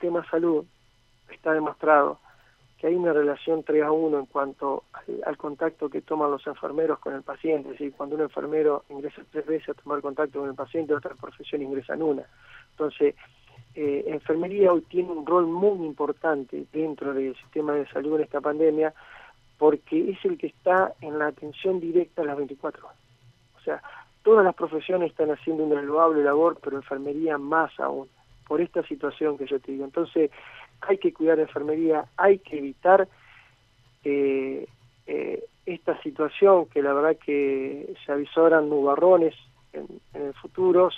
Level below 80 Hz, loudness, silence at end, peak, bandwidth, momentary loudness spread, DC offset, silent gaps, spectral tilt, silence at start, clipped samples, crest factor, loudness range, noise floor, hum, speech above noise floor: -66 dBFS; -25 LUFS; 0 s; -6 dBFS; 5.2 kHz; 14 LU; under 0.1%; none; -8 dB/octave; 0 s; under 0.1%; 20 dB; 6 LU; -61 dBFS; none; 37 dB